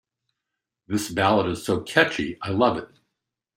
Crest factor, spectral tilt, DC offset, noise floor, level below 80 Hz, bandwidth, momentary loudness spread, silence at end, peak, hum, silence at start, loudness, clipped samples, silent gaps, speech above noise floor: 22 dB; -5 dB/octave; under 0.1%; -84 dBFS; -58 dBFS; 16 kHz; 8 LU; 0.7 s; -2 dBFS; none; 0.9 s; -23 LUFS; under 0.1%; none; 61 dB